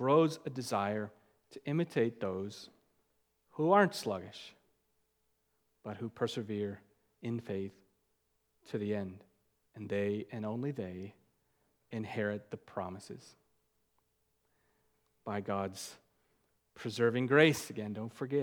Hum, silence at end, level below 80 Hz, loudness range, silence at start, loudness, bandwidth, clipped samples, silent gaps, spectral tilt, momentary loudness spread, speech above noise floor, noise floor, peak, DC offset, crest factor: none; 0 s; -80 dBFS; 11 LU; 0 s; -35 LUFS; 19.5 kHz; under 0.1%; none; -6 dB/octave; 21 LU; 45 dB; -79 dBFS; -10 dBFS; under 0.1%; 26 dB